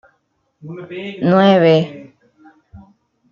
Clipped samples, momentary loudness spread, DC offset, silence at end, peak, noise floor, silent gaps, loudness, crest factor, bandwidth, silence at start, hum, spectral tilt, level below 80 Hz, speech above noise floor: under 0.1%; 22 LU; under 0.1%; 0.55 s; -2 dBFS; -66 dBFS; none; -13 LUFS; 16 dB; 7 kHz; 0.65 s; none; -8 dB/octave; -58 dBFS; 52 dB